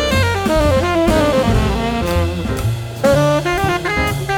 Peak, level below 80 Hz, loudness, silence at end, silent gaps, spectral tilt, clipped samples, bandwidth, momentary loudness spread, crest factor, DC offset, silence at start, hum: -2 dBFS; -26 dBFS; -16 LUFS; 0 s; none; -5.5 dB/octave; under 0.1%; 19 kHz; 6 LU; 14 dB; under 0.1%; 0 s; none